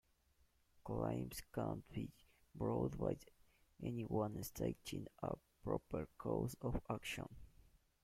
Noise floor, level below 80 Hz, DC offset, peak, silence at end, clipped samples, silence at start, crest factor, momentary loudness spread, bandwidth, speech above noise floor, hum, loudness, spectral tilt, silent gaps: -76 dBFS; -60 dBFS; under 0.1%; -26 dBFS; 0.6 s; under 0.1%; 0.75 s; 20 dB; 8 LU; 16.5 kHz; 32 dB; none; -45 LUFS; -6.5 dB/octave; none